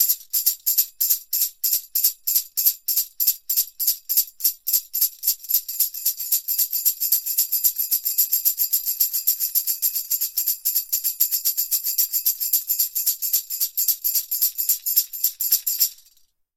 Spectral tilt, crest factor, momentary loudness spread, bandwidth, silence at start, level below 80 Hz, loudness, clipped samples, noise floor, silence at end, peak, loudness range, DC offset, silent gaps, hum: 5.5 dB/octave; 20 dB; 3 LU; 17 kHz; 0 s; -70 dBFS; -20 LUFS; under 0.1%; -59 dBFS; 0.65 s; -2 dBFS; 1 LU; under 0.1%; none; none